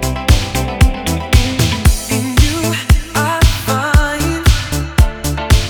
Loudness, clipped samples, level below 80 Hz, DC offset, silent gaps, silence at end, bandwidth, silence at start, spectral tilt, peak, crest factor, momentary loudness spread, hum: -14 LUFS; under 0.1%; -16 dBFS; under 0.1%; none; 0 s; over 20 kHz; 0 s; -4.5 dB/octave; 0 dBFS; 12 dB; 4 LU; none